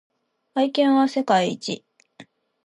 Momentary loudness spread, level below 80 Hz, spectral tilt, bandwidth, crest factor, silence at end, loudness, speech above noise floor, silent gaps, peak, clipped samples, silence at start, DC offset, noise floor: 12 LU; -76 dBFS; -5 dB/octave; 11 kHz; 18 dB; 0.4 s; -21 LUFS; 30 dB; none; -6 dBFS; under 0.1%; 0.55 s; under 0.1%; -50 dBFS